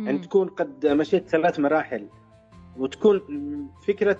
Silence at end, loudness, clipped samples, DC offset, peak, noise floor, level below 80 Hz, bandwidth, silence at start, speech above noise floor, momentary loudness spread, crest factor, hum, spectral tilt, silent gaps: 0 s; -24 LUFS; under 0.1%; under 0.1%; -6 dBFS; -50 dBFS; -62 dBFS; 7.8 kHz; 0 s; 26 dB; 11 LU; 18 dB; none; -7 dB/octave; none